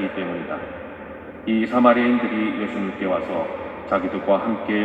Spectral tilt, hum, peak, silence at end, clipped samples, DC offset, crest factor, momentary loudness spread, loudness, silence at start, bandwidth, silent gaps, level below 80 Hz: -8 dB/octave; none; 0 dBFS; 0 s; under 0.1%; under 0.1%; 22 dB; 17 LU; -22 LUFS; 0 s; 7.6 kHz; none; -56 dBFS